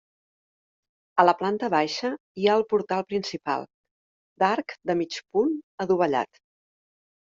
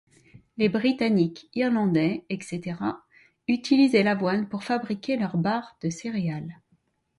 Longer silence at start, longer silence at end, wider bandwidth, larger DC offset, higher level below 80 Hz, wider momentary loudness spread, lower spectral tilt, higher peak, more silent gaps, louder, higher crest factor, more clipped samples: first, 1.15 s vs 0.55 s; first, 1 s vs 0.65 s; second, 7.6 kHz vs 11.5 kHz; neither; second, -70 dBFS vs -64 dBFS; second, 9 LU vs 12 LU; about the same, -5.5 dB/octave vs -6.5 dB/octave; first, -4 dBFS vs -8 dBFS; first, 2.20-2.35 s, 3.74-3.84 s, 3.91-4.36 s, 5.64-5.78 s vs none; about the same, -25 LUFS vs -25 LUFS; first, 24 dB vs 18 dB; neither